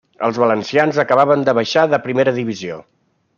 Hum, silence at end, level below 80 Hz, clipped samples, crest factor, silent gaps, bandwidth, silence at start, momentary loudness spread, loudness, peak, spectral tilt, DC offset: none; 0.55 s; -62 dBFS; under 0.1%; 16 dB; none; 7.2 kHz; 0.2 s; 11 LU; -16 LUFS; 0 dBFS; -5.5 dB/octave; under 0.1%